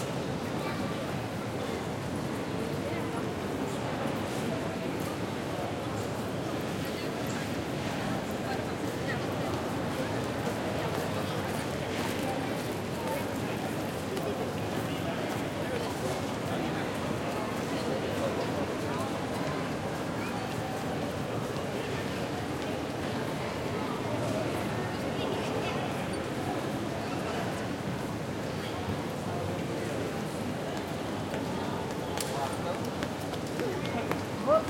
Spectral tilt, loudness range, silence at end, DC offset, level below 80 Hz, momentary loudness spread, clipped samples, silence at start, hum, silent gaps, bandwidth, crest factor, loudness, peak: -5.5 dB/octave; 1 LU; 0 s; under 0.1%; -56 dBFS; 2 LU; under 0.1%; 0 s; none; none; 16.5 kHz; 22 dB; -33 LUFS; -12 dBFS